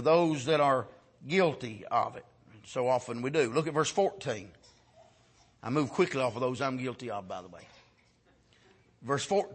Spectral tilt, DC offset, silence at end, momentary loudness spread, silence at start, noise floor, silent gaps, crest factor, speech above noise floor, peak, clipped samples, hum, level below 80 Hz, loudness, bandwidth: -5 dB/octave; under 0.1%; 0 s; 16 LU; 0 s; -66 dBFS; none; 20 dB; 36 dB; -12 dBFS; under 0.1%; none; -70 dBFS; -30 LUFS; 8.8 kHz